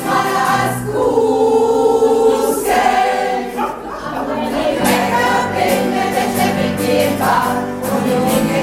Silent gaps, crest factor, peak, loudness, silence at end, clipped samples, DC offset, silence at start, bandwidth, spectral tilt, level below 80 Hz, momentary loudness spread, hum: none; 12 dB; -2 dBFS; -15 LUFS; 0 s; under 0.1%; under 0.1%; 0 s; 16.5 kHz; -4.5 dB/octave; -44 dBFS; 7 LU; none